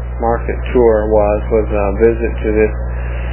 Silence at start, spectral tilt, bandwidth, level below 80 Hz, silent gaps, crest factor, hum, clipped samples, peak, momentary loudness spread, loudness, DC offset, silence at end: 0 s; -12 dB/octave; 3.2 kHz; -20 dBFS; none; 14 dB; 60 Hz at -20 dBFS; under 0.1%; 0 dBFS; 7 LU; -15 LUFS; under 0.1%; 0 s